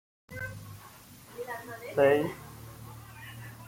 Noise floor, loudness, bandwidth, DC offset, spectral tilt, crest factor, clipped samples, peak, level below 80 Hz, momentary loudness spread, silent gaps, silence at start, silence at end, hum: -51 dBFS; -30 LUFS; 16.5 kHz; under 0.1%; -6 dB/octave; 22 dB; under 0.1%; -12 dBFS; -62 dBFS; 23 LU; none; 0.3 s; 0 s; none